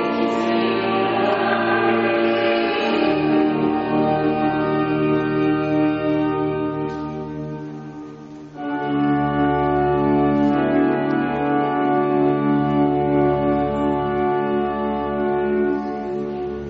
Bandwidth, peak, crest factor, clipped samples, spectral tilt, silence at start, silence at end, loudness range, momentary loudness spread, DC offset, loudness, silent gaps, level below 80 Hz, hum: 6.8 kHz; -6 dBFS; 14 dB; under 0.1%; -5 dB/octave; 0 s; 0 s; 5 LU; 9 LU; under 0.1%; -20 LUFS; none; -46 dBFS; none